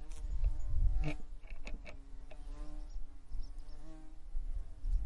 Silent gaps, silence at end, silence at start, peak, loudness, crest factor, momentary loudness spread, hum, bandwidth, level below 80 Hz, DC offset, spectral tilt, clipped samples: none; 0 s; 0 s; -18 dBFS; -45 LUFS; 16 dB; 17 LU; none; 7.2 kHz; -38 dBFS; under 0.1%; -6.5 dB/octave; under 0.1%